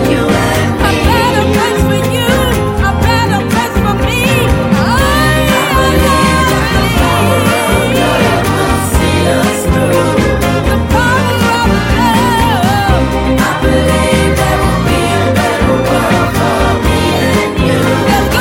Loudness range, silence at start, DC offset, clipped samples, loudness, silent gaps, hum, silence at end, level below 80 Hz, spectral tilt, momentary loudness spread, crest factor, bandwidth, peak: 1 LU; 0 s; under 0.1%; under 0.1%; -10 LUFS; none; none; 0 s; -20 dBFS; -5 dB/octave; 2 LU; 10 dB; 17 kHz; 0 dBFS